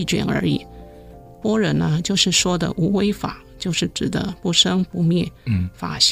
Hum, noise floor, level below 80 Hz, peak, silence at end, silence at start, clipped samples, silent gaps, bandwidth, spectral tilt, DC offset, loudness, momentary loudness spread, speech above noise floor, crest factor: none; -41 dBFS; -44 dBFS; -2 dBFS; 0 s; 0 s; under 0.1%; none; 15.5 kHz; -4 dB/octave; under 0.1%; -20 LUFS; 10 LU; 22 dB; 18 dB